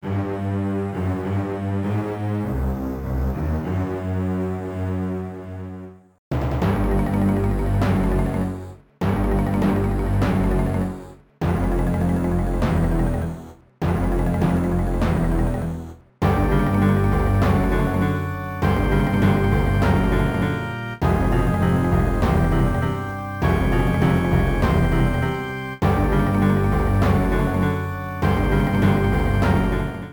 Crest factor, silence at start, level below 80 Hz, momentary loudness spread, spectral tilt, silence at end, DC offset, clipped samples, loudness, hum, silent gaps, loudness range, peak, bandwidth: 14 dB; 0.05 s; -28 dBFS; 8 LU; -8 dB/octave; 0 s; under 0.1%; under 0.1%; -21 LUFS; none; 6.18-6.31 s; 5 LU; -6 dBFS; over 20 kHz